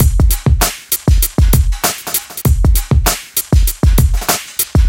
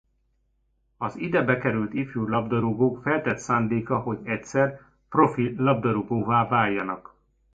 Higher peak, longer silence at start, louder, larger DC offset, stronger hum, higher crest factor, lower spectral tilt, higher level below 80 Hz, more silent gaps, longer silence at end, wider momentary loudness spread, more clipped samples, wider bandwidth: first, 0 dBFS vs -6 dBFS; second, 0 s vs 1 s; first, -14 LUFS vs -25 LUFS; neither; neither; second, 12 dB vs 20 dB; second, -4.5 dB/octave vs -7.5 dB/octave; first, -14 dBFS vs -56 dBFS; neither; second, 0 s vs 0.55 s; second, 4 LU vs 7 LU; neither; first, 17.5 kHz vs 7.8 kHz